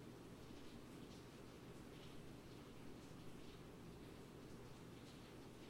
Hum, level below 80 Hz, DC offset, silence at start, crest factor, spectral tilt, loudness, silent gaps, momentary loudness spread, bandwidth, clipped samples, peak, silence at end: none; -70 dBFS; under 0.1%; 0 s; 14 dB; -5.5 dB/octave; -59 LUFS; none; 1 LU; 16 kHz; under 0.1%; -44 dBFS; 0 s